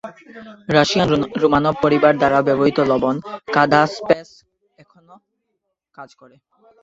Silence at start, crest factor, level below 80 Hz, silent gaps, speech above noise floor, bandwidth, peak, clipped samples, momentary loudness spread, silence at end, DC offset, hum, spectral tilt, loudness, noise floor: 0.05 s; 18 dB; -52 dBFS; none; 58 dB; 8 kHz; 0 dBFS; under 0.1%; 7 LU; 0.75 s; under 0.1%; none; -6 dB/octave; -17 LUFS; -75 dBFS